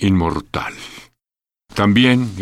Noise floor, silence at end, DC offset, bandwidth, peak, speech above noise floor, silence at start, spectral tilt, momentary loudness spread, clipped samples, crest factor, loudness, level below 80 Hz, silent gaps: under -90 dBFS; 0 s; under 0.1%; 13 kHz; -2 dBFS; over 74 dB; 0 s; -6 dB/octave; 18 LU; under 0.1%; 16 dB; -16 LUFS; -40 dBFS; none